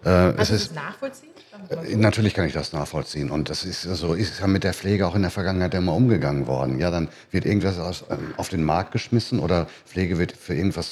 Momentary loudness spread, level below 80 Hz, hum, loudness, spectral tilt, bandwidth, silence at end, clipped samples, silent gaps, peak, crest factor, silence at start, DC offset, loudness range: 10 LU; -46 dBFS; none; -24 LUFS; -6 dB/octave; 14 kHz; 0 s; under 0.1%; none; -4 dBFS; 20 dB; 0 s; under 0.1%; 2 LU